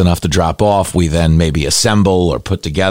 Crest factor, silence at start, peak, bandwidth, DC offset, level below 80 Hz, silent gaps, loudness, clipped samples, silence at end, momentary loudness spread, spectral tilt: 10 dB; 0 s; -2 dBFS; 16.5 kHz; under 0.1%; -26 dBFS; none; -13 LUFS; under 0.1%; 0 s; 5 LU; -5 dB/octave